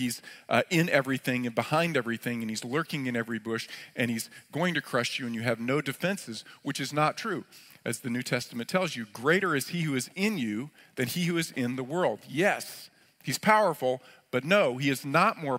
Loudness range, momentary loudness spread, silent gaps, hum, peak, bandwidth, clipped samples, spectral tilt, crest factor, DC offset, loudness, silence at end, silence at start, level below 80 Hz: 4 LU; 11 LU; none; none; -6 dBFS; 16 kHz; under 0.1%; -4.5 dB/octave; 24 dB; under 0.1%; -29 LUFS; 0 s; 0 s; -74 dBFS